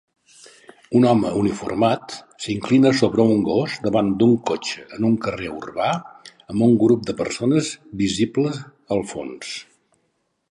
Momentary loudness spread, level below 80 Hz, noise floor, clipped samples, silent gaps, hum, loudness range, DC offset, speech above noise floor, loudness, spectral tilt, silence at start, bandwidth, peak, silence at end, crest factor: 13 LU; -54 dBFS; -70 dBFS; under 0.1%; none; none; 3 LU; under 0.1%; 50 dB; -20 LUFS; -6 dB/octave; 0.9 s; 11 kHz; -2 dBFS; 0.9 s; 18 dB